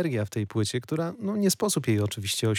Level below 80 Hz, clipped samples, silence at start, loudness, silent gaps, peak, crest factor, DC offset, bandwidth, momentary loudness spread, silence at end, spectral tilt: -66 dBFS; under 0.1%; 0 s; -27 LUFS; none; -12 dBFS; 14 dB; under 0.1%; 18 kHz; 5 LU; 0 s; -5 dB/octave